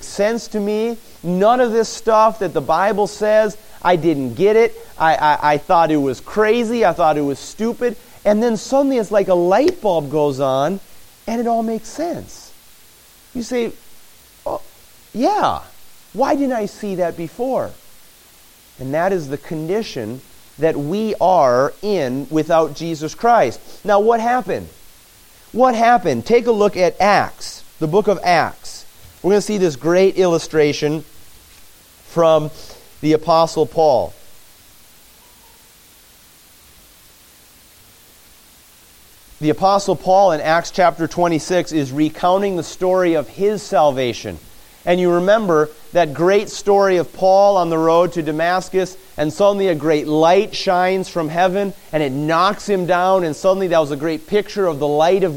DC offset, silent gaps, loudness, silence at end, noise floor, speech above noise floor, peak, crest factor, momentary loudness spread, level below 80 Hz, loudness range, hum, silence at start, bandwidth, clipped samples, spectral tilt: under 0.1%; none; -17 LUFS; 0 s; -47 dBFS; 31 dB; -2 dBFS; 16 dB; 11 LU; -48 dBFS; 7 LU; none; 0 s; 17 kHz; under 0.1%; -5.5 dB/octave